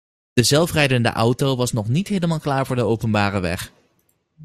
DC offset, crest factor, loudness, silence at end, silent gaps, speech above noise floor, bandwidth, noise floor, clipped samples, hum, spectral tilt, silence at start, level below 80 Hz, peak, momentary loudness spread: under 0.1%; 18 dB; -20 LUFS; 0 s; none; 47 dB; 15.5 kHz; -66 dBFS; under 0.1%; none; -5 dB/octave; 0.35 s; -48 dBFS; -2 dBFS; 8 LU